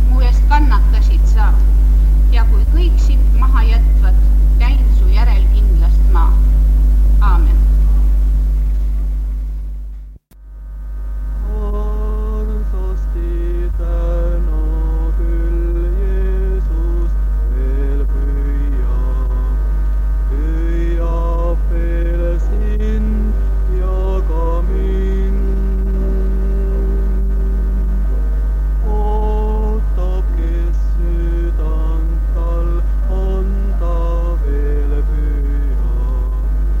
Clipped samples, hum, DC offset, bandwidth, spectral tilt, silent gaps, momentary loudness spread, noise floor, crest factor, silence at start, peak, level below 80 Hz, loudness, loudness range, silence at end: under 0.1%; none; under 0.1%; 5 kHz; -8.5 dB/octave; none; 7 LU; -35 dBFS; 12 dB; 0 s; 0 dBFS; -12 dBFS; -17 LUFS; 7 LU; 0 s